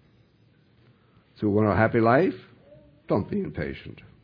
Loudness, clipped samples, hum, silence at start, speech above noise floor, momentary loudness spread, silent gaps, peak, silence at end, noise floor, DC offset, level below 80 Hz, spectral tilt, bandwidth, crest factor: -24 LUFS; under 0.1%; none; 1.4 s; 37 dB; 18 LU; none; -6 dBFS; 0.3 s; -61 dBFS; under 0.1%; -54 dBFS; -10.5 dB/octave; 5.2 kHz; 22 dB